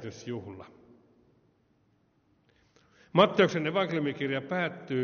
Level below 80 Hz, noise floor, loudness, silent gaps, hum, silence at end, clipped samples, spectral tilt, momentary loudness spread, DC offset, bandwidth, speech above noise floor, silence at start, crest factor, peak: -70 dBFS; -69 dBFS; -28 LUFS; none; none; 0 s; under 0.1%; -4 dB/octave; 16 LU; under 0.1%; 6.8 kHz; 41 dB; 0 s; 22 dB; -8 dBFS